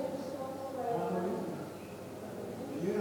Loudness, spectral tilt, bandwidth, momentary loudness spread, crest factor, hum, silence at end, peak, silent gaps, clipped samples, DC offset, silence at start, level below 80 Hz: -39 LUFS; -6.5 dB/octave; 19 kHz; 10 LU; 16 dB; none; 0 s; -22 dBFS; none; under 0.1%; under 0.1%; 0 s; -72 dBFS